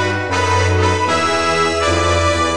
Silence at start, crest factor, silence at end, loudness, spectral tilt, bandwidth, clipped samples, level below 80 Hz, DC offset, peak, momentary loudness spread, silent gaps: 0 s; 14 dB; 0 s; -15 LUFS; -4.5 dB/octave; 10.5 kHz; under 0.1%; -34 dBFS; 2%; -2 dBFS; 1 LU; none